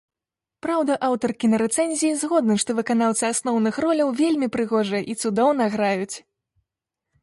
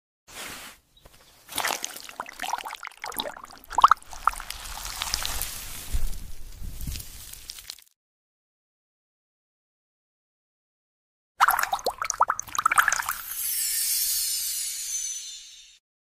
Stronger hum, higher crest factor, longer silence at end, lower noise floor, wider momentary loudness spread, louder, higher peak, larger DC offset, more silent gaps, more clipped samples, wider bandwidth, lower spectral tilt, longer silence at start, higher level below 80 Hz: neither; second, 16 dB vs 26 dB; first, 1.05 s vs 0.4 s; first, -88 dBFS vs -55 dBFS; second, 5 LU vs 19 LU; first, -22 LUFS vs -26 LUFS; about the same, -6 dBFS vs -4 dBFS; neither; second, none vs 7.96-11.35 s; neither; second, 11.5 kHz vs 16 kHz; first, -4 dB/octave vs 0 dB/octave; first, 0.65 s vs 0.3 s; second, -64 dBFS vs -42 dBFS